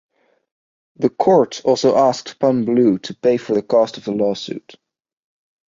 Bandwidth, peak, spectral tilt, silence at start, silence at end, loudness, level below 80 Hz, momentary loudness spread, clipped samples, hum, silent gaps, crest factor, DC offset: 7.6 kHz; -2 dBFS; -6 dB/octave; 1 s; 1.1 s; -17 LUFS; -62 dBFS; 7 LU; under 0.1%; none; none; 16 dB; under 0.1%